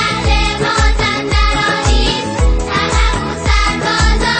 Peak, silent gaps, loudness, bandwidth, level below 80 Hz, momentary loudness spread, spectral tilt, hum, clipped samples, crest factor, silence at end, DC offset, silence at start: 0 dBFS; none; -14 LUFS; 8.8 kHz; -16 dBFS; 3 LU; -4 dB/octave; none; under 0.1%; 12 dB; 0 s; under 0.1%; 0 s